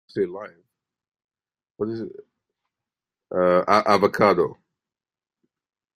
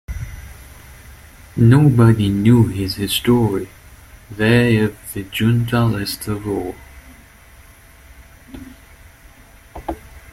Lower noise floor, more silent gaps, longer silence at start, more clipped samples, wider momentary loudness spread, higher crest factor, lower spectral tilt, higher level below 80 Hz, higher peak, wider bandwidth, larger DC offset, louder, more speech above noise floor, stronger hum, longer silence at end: first, under -90 dBFS vs -45 dBFS; first, 1.24-1.28 s vs none; about the same, 0.15 s vs 0.1 s; neither; second, 18 LU vs 23 LU; first, 24 dB vs 16 dB; about the same, -6 dB/octave vs -6.5 dB/octave; second, -64 dBFS vs -40 dBFS; about the same, -2 dBFS vs -2 dBFS; about the same, 15.5 kHz vs 16 kHz; neither; second, -21 LUFS vs -16 LUFS; first, over 69 dB vs 29 dB; neither; first, 1.4 s vs 0.15 s